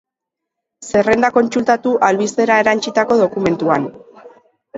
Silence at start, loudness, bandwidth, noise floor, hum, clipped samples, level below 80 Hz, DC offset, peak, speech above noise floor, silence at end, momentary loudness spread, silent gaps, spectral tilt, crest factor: 0.8 s; -15 LUFS; 8 kHz; -81 dBFS; none; under 0.1%; -54 dBFS; under 0.1%; 0 dBFS; 67 dB; 0 s; 5 LU; none; -5 dB/octave; 16 dB